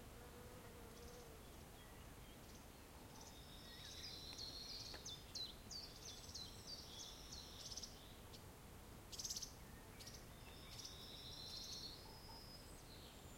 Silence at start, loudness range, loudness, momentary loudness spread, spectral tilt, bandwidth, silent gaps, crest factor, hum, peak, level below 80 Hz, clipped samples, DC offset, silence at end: 0 s; 6 LU; -54 LUFS; 10 LU; -2.5 dB/octave; 16.5 kHz; none; 20 dB; none; -36 dBFS; -64 dBFS; under 0.1%; under 0.1%; 0 s